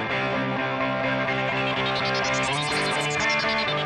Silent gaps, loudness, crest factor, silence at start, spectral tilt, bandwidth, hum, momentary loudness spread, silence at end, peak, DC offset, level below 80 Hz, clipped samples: none; -24 LUFS; 12 dB; 0 s; -4 dB/octave; 11.5 kHz; none; 3 LU; 0 s; -12 dBFS; under 0.1%; -52 dBFS; under 0.1%